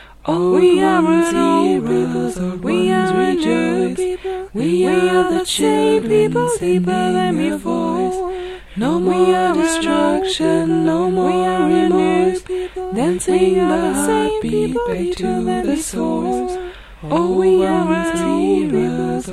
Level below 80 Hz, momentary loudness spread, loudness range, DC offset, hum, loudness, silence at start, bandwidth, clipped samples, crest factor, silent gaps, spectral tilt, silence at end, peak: -42 dBFS; 8 LU; 3 LU; under 0.1%; none; -16 LUFS; 0 s; 13.5 kHz; under 0.1%; 14 dB; none; -5.5 dB/octave; 0 s; -2 dBFS